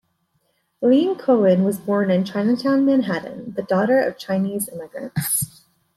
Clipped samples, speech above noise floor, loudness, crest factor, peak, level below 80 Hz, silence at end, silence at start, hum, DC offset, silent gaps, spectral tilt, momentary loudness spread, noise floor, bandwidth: under 0.1%; 49 dB; -20 LUFS; 16 dB; -6 dBFS; -62 dBFS; 0.5 s; 0.8 s; none; under 0.1%; none; -5.5 dB/octave; 11 LU; -68 dBFS; 15.5 kHz